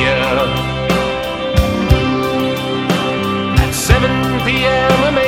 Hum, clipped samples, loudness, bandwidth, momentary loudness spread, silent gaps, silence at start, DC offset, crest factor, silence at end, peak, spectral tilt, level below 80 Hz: none; 0.1%; -15 LUFS; 19 kHz; 5 LU; none; 0 s; under 0.1%; 14 dB; 0 s; 0 dBFS; -5 dB/octave; -24 dBFS